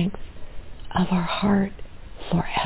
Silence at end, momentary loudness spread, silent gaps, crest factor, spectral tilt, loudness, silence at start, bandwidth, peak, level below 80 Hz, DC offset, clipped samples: 0 s; 23 LU; none; 16 dB; -11 dB/octave; -24 LUFS; 0 s; 4 kHz; -8 dBFS; -40 dBFS; under 0.1%; under 0.1%